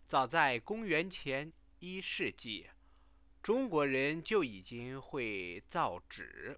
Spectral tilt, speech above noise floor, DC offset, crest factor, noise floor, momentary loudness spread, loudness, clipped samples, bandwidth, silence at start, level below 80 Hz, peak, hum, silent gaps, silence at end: -3 dB/octave; 29 dB; under 0.1%; 22 dB; -66 dBFS; 14 LU; -36 LUFS; under 0.1%; 4 kHz; 0.1 s; -66 dBFS; -14 dBFS; none; none; 0 s